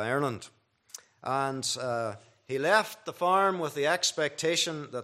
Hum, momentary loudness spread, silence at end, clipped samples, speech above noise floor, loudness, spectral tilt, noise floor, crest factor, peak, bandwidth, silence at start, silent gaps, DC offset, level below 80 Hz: none; 16 LU; 0 s; under 0.1%; 22 dB; -28 LUFS; -3 dB/octave; -51 dBFS; 22 dB; -8 dBFS; 14.5 kHz; 0 s; none; under 0.1%; -78 dBFS